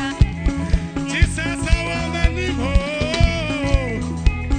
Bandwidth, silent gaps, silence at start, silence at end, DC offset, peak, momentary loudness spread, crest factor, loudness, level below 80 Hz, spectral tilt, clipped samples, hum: 9.4 kHz; none; 0 s; 0 s; under 0.1%; -2 dBFS; 4 LU; 16 dB; -21 LUFS; -22 dBFS; -5.5 dB/octave; under 0.1%; none